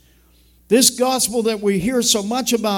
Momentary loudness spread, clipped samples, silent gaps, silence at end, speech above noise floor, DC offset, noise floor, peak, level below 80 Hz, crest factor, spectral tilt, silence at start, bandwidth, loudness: 5 LU; under 0.1%; none; 0 s; 36 dB; under 0.1%; -53 dBFS; 0 dBFS; -50 dBFS; 18 dB; -3 dB/octave; 0.7 s; 18 kHz; -17 LUFS